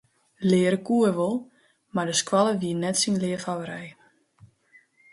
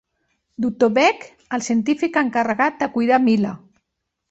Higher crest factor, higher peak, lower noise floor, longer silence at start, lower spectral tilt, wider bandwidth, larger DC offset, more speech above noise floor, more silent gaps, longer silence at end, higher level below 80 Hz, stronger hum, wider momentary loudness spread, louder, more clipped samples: about the same, 18 dB vs 18 dB; second, -8 dBFS vs -4 dBFS; second, -59 dBFS vs -78 dBFS; second, 0.4 s vs 0.6 s; about the same, -4.5 dB/octave vs -5 dB/octave; first, 11.5 kHz vs 8.2 kHz; neither; second, 36 dB vs 59 dB; neither; first, 1.2 s vs 0.75 s; second, -68 dBFS vs -62 dBFS; neither; about the same, 11 LU vs 11 LU; second, -24 LUFS vs -19 LUFS; neither